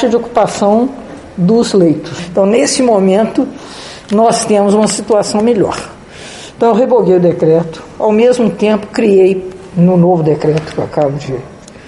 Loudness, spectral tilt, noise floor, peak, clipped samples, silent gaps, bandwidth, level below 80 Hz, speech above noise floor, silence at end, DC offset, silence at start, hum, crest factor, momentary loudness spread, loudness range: -11 LUFS; -6 dB/octave; -30 dBFS; 0 dBFS; under 0.1%; none; 11.5 kHz; -44 dBFS; 20 dB; 0 s; under 0.1%; 0 s; none; 12 dB; 14 LU; 2 LU